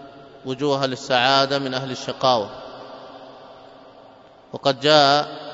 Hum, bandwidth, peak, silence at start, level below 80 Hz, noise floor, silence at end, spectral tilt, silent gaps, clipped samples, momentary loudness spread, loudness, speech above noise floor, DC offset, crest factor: none; 8 kHz; 0 dBFS; 0 s; -66 dBFS; -48 dBFS; 0 s; -4 dB/octave; none; under 0.1%; 24 LU; -19 LUFS; 28 dB; under 0.1%; 22 dB